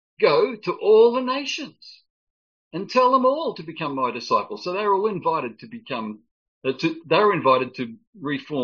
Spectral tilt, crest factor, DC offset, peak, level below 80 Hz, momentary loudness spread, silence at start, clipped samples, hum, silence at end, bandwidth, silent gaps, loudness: -3 dB/octave; 18 dB; under 0.1%; -4 dBFS; -72 dBFS; 16 LU; 0.2 s; under 0.1%; none; 0 s; 7 kHz; 2.10-2.71 s, 6.31-6.61 s, 8.07-8.13 s; -22 LUFS